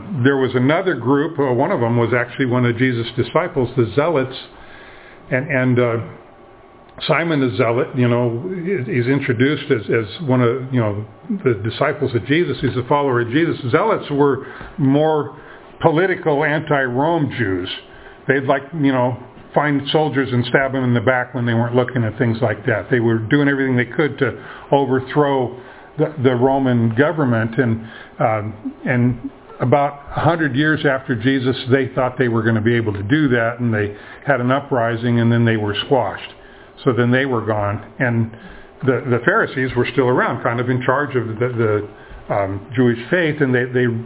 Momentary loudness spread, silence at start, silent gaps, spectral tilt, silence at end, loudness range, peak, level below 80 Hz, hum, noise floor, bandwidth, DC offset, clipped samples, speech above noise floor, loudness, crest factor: 7 LU; 0 s; none; -11 dB/octave; 0 s; 2 LU; 0 dBFS; -48 dBFS; none; -44 dBFS; 4 kHz; under 0.1%; under 0.1%; 26 dB; -18 LUFS; 18 dB